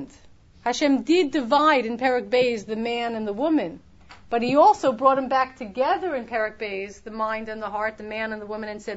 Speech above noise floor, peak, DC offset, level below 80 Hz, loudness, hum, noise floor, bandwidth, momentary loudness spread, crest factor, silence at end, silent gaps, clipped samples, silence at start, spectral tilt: 28 dB; -4 dBFS; under 0.1%; -56 dBFS; -23 LUFS; none; -51 dBFS; 8 kHz; 12 LU; 18 dB; 0 s; none; under 0.1%; 0 s; -4.5 dB/octave